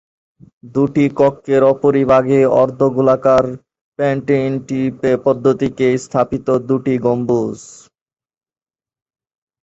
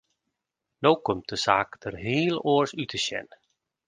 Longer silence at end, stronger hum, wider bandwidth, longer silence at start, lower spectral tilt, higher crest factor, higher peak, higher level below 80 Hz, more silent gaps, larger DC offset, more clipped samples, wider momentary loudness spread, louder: first, 1.9 s vs 0.65 s; neither; second, 8 kHz vs 10 kHz; second, 0.65 s vs 0.8 s; first, -7.5 dB/octave vs -4.5 dB/octave; second, 16 dB vs 24 dB; first, 0 dBFS vs -4 dBFS; first, -50 dBFS vs -60 dBFS; first, 3.81-3.92 s vs none; neither; neither; about the same, 8 LU vs 8 LU; first, -15 LUFS vs -26 LUFS